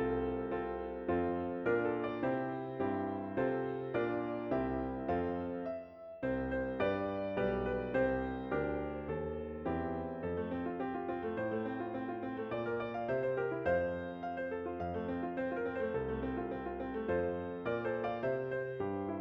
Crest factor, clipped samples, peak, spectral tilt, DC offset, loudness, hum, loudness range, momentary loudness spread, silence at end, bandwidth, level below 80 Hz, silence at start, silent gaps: 16 dB; under 0.1%; -22 dBFS; -9.5 dB/octave; under 0.1%; -37 LUFS; none; 3 LU; 5 LU; 0 s; 5.8 kHz; -56 dBFS; 0 s; none